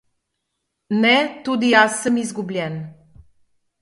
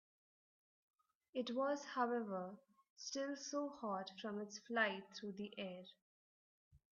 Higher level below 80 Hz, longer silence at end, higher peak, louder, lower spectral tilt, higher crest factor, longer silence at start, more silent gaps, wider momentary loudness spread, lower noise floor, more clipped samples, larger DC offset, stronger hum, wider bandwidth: first, -60 dBFS vs -88 dBFS; first, 0.9 s vs 0.15 s; first, 0 dBFS vs -24 dBFS; first, -18 LUFS vs -44 LUFS; first, -4 dB/octave vs -2.5 dB/octave; about the same, 20 dB vs 22 dB; second, 0.9 s vs 1.35 s; second, none vs 2.90-2.96 s, 6.02-6.71 s; about the same, 13 LU vs 12 LU; second, -77 dBFS vs under -90 dBFS; neither; neither; neither; first, 11.5 kHz vs 7.2 kHz